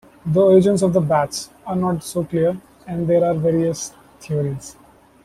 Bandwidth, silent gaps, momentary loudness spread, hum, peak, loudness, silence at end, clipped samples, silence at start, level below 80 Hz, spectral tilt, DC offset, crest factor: 15 kHz; none; 16 LU; none; -2 dBFS; -19 LUFS; 0.55 s; under 0.1%; 0.25 s; -52 dBFS; -6.5 dB/octave; under 0.1%; 16 dB